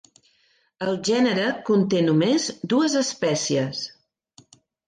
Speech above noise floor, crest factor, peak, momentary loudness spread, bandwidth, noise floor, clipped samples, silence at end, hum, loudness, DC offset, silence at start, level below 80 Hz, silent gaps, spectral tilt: 43 dB; 14 dB; -8 dBFS; 9 LU; 10 kHz; -64 dBFS; under 0.1%; 1 s; none; -22 LUFS; under 0.1%; 0.8 s; -66 dBFS; none; -4.5 dB/octave